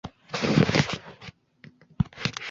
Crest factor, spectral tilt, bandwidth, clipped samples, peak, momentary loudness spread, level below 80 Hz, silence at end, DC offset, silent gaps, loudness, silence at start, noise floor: 22 dB; -5.5 dB/octave; 7.8 kHz; under 0.1%; -4 dBFS; 23 LU; -48 dBFS; 0 s; under 0.1%; none; -26 LUFS; 0.05 s; -54 dBFS